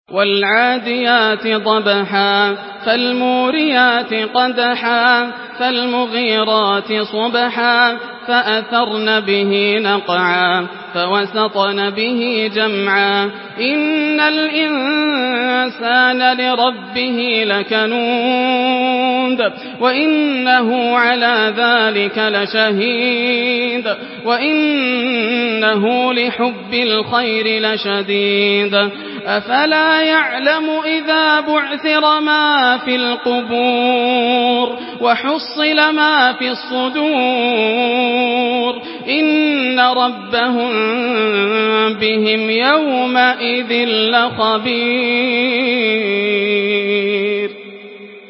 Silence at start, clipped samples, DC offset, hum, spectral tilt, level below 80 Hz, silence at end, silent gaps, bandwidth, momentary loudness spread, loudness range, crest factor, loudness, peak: 0.1 s; under 0.1%; under 0.1%; none; -8 dB/octave; -66 dBFS; 0 s; none; 5.8 kHz; 5 LU; 2 LU; 14 dB; -14 LUFS; 0 dBFS